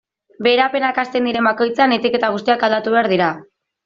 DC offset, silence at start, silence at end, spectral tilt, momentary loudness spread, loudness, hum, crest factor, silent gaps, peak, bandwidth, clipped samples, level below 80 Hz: under 0.1%; 0.4 s; 0.45 s; -2 dB/octave; 4 LU; -17 LUFS; none; 14 dB; none; -2 dBFS; 7.4 kHz; under 0.1%; -62 dBFS